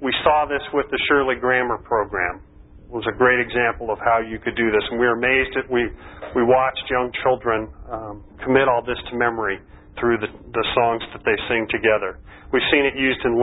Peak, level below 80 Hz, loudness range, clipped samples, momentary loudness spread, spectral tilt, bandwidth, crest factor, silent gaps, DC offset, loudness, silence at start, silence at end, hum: -2 dBFS; -44 dBFS; 2 LU; under 0.1%; 10 LU; -10 dB/octave; 4 kHz; 20 dB; none; under 0.1%; -20 LUFS; 0 s; 0 s; none